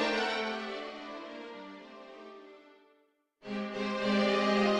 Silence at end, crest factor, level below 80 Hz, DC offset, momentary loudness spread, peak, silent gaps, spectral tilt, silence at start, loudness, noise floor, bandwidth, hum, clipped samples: 0 s; 18 dB; -72 dBFS; under 0.1%; 22 LU; -16 dBFS; none; -5 dB/octave; 0 s; -33 LUFS; -71 dBFS; 10 kHz; none; under 0.1%